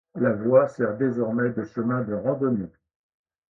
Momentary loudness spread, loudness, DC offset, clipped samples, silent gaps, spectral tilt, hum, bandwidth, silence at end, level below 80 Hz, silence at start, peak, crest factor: 8 LU; -24 LUFS; under 0.1%; under 0.1%; none; -10.5 dB/octave; none; 7 kHz; 0.8 s; -62 dBFS; 0.15 s; -6 dBFS; 20 dB